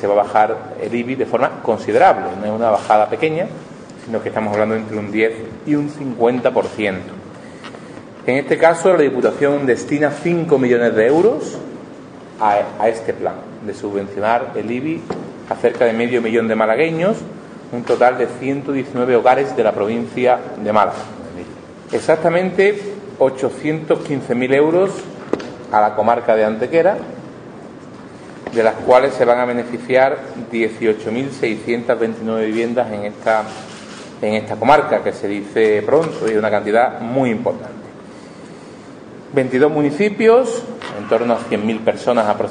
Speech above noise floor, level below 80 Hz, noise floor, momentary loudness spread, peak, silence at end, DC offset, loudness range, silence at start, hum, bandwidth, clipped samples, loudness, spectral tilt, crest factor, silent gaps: 20 dB; -56 dBFS; -36 dBFS; 20 LU; 0 dBFS; 0 s; under 0.1%; 4 LU; 0 s; none; 10 kHz; under 0.1%; -17 LUFS; -6 dB/octave; 18 dB; none